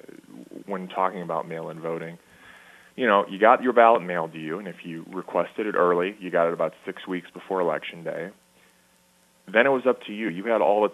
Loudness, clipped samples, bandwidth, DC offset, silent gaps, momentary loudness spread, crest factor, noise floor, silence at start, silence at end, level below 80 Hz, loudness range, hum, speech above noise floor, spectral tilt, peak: -24 LUFS; under 0.1%; 13 kHz; under 0.1%; none; 17 LU; 22 dB; -61 dBFS; 0.35 s; 0 s; -76 dBFS; 6 LU; none; 37 dB; -6.5 dB/octave; -2 dBFS